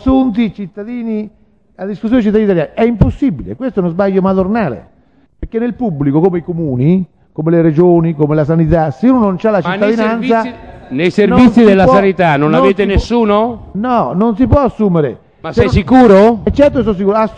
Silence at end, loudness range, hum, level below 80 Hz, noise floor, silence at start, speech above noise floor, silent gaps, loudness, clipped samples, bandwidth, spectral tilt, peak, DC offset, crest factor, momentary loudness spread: 0 s; 5 LU; none; -30 dBFS; -39 dBFS; 0 s; 28 dB; none; -11 LUFS; under 0.1%; 8.6 kHz; -8.5 dB/octave; 0 dBFS; 0.2%; 12 dB; 13 LU